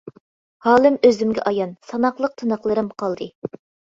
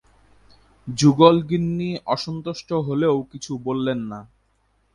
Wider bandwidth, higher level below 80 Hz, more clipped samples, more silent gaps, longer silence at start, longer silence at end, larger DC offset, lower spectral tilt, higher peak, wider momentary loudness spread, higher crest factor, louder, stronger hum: second, 7.6 kHz vs 11.5 kHz; second, -60 dBFS vs -54 dBFS; neither; first, 0.20-0.60 s, 3.35-3.42 s vs none; second, 0.05 s vs 0.85 s; second, 0.4 s vs 0.7 s; neither; about the same, -6 dB/octave vs -6.5 dB/octave; about the same, -2 dBFS vs 0 dBFS; second, 14 LU vs 17 LU; about the same, 18 dB vs 22 dB; about the same, -20 LUFS vs -21 LUFS; neither